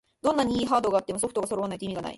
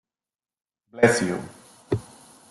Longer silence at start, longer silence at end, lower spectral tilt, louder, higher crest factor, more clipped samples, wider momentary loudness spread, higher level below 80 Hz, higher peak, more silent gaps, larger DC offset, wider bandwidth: second, 0.25 s vs 0.95 s; second, 0 s vs 0.5 s; about the same, -4.5 dB/octave vs -5 dB/octave; second, -27 LUFS vs -24 LUFS; second, 16 dB vs 24 dB; neither; second, 7 LU vs 13 LU; about the same, -56 dBFS vs -58 dBFS; second, -10 dBFS vs -4 dBFS; neither; neither; about the same, 12 kHz vs 12.5 kHz